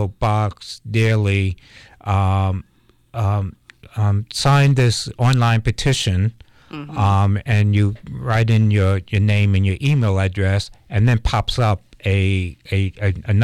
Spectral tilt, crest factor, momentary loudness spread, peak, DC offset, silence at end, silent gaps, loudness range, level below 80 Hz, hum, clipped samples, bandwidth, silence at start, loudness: -6 dB/octave; 12 dB; 9 LU; -6 dBFS; under 0.1%; 0 s; none; 4 LU; -38 dBFS; none; under 0.1%; 11.5 kHz; 0 s; -18 LUFS